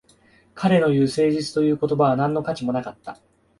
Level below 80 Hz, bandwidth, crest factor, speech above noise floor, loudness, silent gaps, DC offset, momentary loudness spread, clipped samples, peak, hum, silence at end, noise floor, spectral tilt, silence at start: -58 dBFS; 11.5 kHz; 16 dB; 36 dB; -21 LUFS; none; under 0.1%; 12 LU; under 0.1%; -4 dBFS; none; 0.45 s; -56 dBFS; -7 dB/octave; 0.55 s